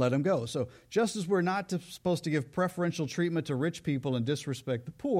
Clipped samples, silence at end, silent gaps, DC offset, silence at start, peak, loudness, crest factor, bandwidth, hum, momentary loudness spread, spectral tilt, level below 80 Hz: under 0.1%; 0 s; none; under 0.1%; 0 s; -16 dBFS; -31 LUFS; 14 dB; 15.5 kHz; none; 6 LU; -6 dB/octave; -66 dBFS